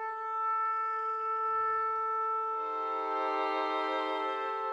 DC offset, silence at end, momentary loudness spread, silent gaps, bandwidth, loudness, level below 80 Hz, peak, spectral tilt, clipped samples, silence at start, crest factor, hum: under 0.1%; 0 s; 3 LU; none; 7.8 kHz; -32 LUFS; -78 dBFS; -20 dBFS; -3 dB/octave; under 0.1%; 0 s; 12 dB; none